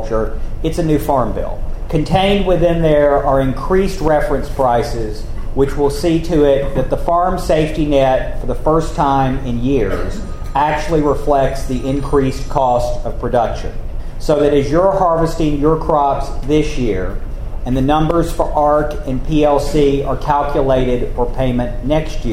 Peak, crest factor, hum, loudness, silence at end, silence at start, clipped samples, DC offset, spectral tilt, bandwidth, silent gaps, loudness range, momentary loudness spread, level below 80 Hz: 0 dBFS; 14 dB; none; -16 LUFS; 0 s; 0 s; under 0.1%; under 0.1%; -7 dB/octave; 14.5 kHz; none; 2 LU; 10 LU; -22 dBFS